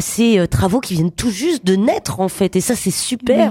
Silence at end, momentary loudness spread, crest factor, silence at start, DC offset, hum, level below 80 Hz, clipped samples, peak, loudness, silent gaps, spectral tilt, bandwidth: 0 s; 5 LU; 14 dB; 0 s; under 0.1%; none; -38 dBFS; under 0.1%; -2 dBFS; -17 LUFS; none; -5 dB/octave; 17 kHz